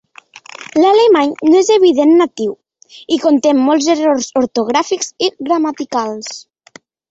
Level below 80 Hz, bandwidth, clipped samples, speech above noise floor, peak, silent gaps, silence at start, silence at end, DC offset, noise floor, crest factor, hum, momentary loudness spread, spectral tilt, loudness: -60 dBFS; 8 kHz; under 0.1%; 32 dB; -2 dBFS; none; 0.6 s; 0.7 s; under 0.1%; -44 dBFS; 12 dB; none; 12 LU; -3 dB/octave; -13 LUFS